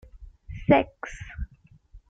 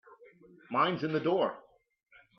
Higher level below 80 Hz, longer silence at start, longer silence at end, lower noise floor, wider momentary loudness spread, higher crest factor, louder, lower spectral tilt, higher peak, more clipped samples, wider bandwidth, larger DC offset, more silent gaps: first, -44 dBFS vs -78 dBFS; about the same, 0.2 s vs 0.1 s; second, 0.1 s vs 0.8 s; about the same, -55 dBFS vs -58 dBFS; first, 20 LU vs 6 LU; about the same, 22 dB vs 20 dB; first, -24 LUFS vs -31 LUFS; about the same, -7.5 dB/octave vs -8 dB/octave; first, -6 dBFS vs -14 dBFS; neither; first, 7.8 kHz vs 6.2 kHz; neither; neither